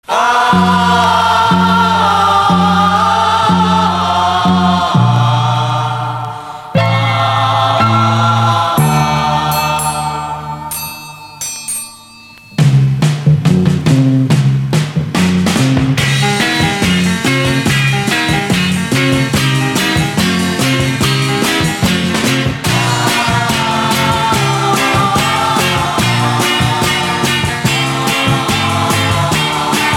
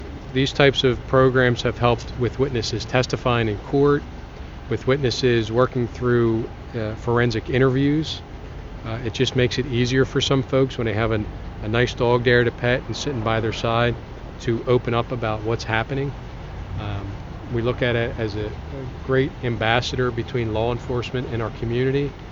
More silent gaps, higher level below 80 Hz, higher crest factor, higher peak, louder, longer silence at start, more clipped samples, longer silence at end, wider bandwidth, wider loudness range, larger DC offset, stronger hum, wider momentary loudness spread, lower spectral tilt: neither; about the same, -38 dBFS vs -38 dBFS; second, 12 dB vs 22 dB; about the same, 0 dBFS vs 0 dBFS; first, -12 LUFS vs -22 LUFS; about the same, 0.1 s vs 0 s; neither; about the same, 0 s vs 0 s; first, 18 kHz vs 7.6 kHz; about the same, 4 LU vs 5 LU; neither; neither; second, 6 LU vs 13 LU; second, -4.5 dB/octave vs -6 dB/octave